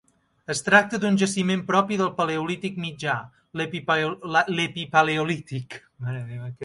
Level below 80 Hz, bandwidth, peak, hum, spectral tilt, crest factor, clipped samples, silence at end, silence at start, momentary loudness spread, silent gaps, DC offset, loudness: -64 dBFS; 11.5 kHz; -4 dBFS; none; -4.5 dB/octave; 22 dB; under 0.1%; 0 s; 0.5 s; 16 LU; none; under 0.1%; -24 LUFS